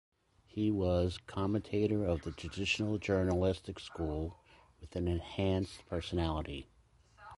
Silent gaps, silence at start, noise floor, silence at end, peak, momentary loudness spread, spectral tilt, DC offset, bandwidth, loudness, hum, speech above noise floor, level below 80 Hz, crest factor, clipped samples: none; 0.55 s; -64 dBFS; 0 s; -18 dBFS; 11 LU; -6.5 dB/octave; under 0.1%; 11.5 kHz; -35 LUFS; none; 30 dB; -48 dBFS; 18 dB; under 0.1%